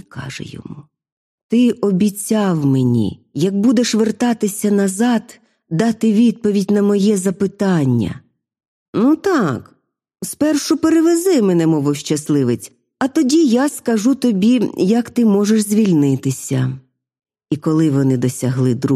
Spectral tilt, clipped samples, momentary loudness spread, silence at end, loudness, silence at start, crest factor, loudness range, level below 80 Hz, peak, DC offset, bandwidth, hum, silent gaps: -6 dB/octave; under 0.1%; 11 LU; 0 s; -16 LUFS; 0.15 s; 14 dB; 3 LU; -56 dBFS; -2 dBFS; under 0.1%; 15 kHz; none; 1.12-1.49 s, 8.68-8.93 s